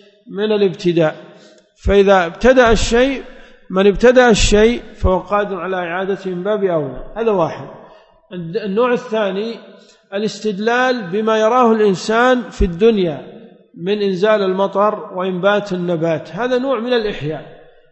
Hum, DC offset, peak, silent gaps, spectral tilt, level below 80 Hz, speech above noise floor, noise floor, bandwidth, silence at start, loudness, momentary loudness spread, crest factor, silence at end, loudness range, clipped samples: none; under 0.1%; 0 dBFS; none; -5 dB/octave; -30 dBFS; 30 dB; -45 dBFS; 8.4 kHz; 0.25 s; -16 LUFS; 13 LU; 16 dB; 0.35 s; 7 LU; under 0.1%